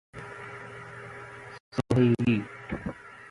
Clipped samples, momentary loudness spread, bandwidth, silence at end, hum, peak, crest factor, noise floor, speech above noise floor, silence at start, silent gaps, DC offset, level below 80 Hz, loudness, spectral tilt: under 0.1%; 20 LU; 11.5 kHz; 0.1 s; none; -10 dBFS; 20 dB; -44 dBFS; 18 dB; 0.15 s; 1.60-1.72 s; under 0.1%; -54 dBFS; -28 LUFS; -8 dB/octave